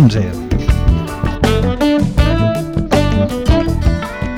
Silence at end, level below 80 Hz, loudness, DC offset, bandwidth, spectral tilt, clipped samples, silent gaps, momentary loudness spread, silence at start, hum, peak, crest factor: 0 s; -20 dBFS; -15 LUFS; under 0.1%; 16 kHz; -7 dB/octave; under 0.1%; none; 5 LU; 0 s; none; 0 dBFS; 12 dB